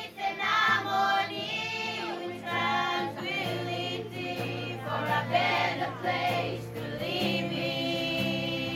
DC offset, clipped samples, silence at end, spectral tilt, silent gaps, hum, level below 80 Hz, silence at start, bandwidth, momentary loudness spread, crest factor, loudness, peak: under 0.1%; under 0.1%; 0 s; -4.5 dB/octave; none; none; -64 dBFS; 0 s; 16 kHz; 9 LU; 18 dB; -29 LUFS; -12 dBFS